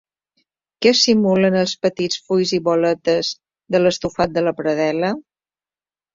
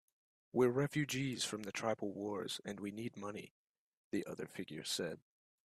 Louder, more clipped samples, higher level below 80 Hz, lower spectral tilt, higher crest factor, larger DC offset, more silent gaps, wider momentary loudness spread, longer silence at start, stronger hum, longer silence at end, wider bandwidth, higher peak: first, -18 LUFS vs -40 LUFS; neither; first, -56 dBFS vs -78 dBFS; about the same, -4.5 dB/octave vs -4.5 dB/octave; about the same, 18 dB vs 20 dB; neither; second, none vs 3.51-4.11 s; second, 8 LU vs 12 LU; first, 0.8 s vs 0.55 s; neither; first, 0.95 s vs 0.5 s; second, 7.8 kHz vs 15 kHz; first, -2 dBFS vs -22 dBFS